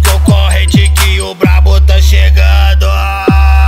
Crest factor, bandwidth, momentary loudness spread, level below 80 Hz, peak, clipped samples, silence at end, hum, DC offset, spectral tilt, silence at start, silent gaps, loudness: 6 dB; 16 kHz; 4 LU; -8 dBFS; 0 dBFS; 0.3%; 0 s; none; under 0.1%; -5 dB/octave; 0 s; none; -8 LUFS